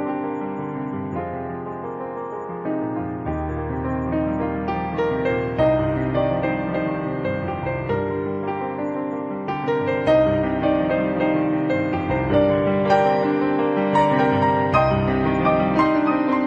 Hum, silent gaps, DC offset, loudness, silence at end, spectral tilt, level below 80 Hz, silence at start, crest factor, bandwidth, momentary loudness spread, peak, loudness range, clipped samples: none; none; under 0.1%; -22 LUFS; 0 s; -8.5 dB/octave; -42 dBFS; 0 s; 16 dB; 8 kHz; 10 LU; -4 dBFS; 8 LU; under 0.1%